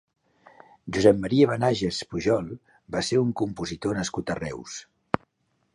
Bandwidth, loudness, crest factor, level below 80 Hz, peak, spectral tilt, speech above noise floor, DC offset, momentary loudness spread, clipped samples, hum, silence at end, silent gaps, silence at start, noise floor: 11.5 kHz; -25 LUFS; 24 dB; -52 dBFS; -2 dBFS; -5.5 dB/octave; 48 dB; under 0.1%; 17 LU; under 0.1%; none; 0.9 s; none; 0.85 s; -72 dBFS